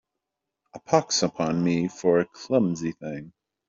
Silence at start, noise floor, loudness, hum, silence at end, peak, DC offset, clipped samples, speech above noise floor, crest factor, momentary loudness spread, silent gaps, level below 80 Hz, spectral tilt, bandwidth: 0.75 s; -84 dBFS; -24 LUFS; none; 0.4 s; -6 dBFS; under 0.1%; under 0.1%; 59 dB; 20 dB; 11 LU; none; -62 dBFS; -5 dB/octave; 7.6 kHz